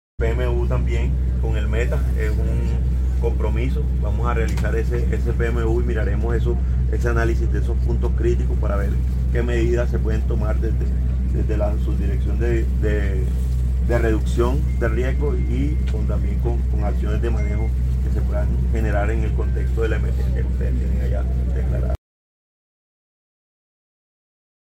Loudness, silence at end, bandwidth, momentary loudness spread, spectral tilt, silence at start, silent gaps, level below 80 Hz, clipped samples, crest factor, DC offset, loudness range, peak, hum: -21 LUFS; 2.65 s; 8 kHz; 2 LU; -8 dB/octave; 0.2 s; none; -20 dBFS; under 0.1%; 14 dB; under 0.1%; 2 LU; -6 dBFS; none